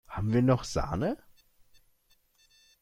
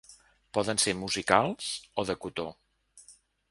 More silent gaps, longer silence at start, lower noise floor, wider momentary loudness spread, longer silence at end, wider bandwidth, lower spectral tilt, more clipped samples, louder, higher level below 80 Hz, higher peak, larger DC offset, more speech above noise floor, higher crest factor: neither; about the same, 0.1 s vs 0.1 s; first, -68 dBFS vs -59 dBFS; second, 8 LU vs 11 LU; first, 1.65 s vs 0.4 s; first, 14 kHz vs 12 kHz; first, -7 dB/octave vs -3 dB/octave; neither; about the same, -29 LUFS vs -29 LUFS; first, -48 dBFS vs -60 dBFS; second, -12 dBFS vs -4 dBFS; neither; first, 41 dB vs 29 dB; second, 20 dB vs 28 dB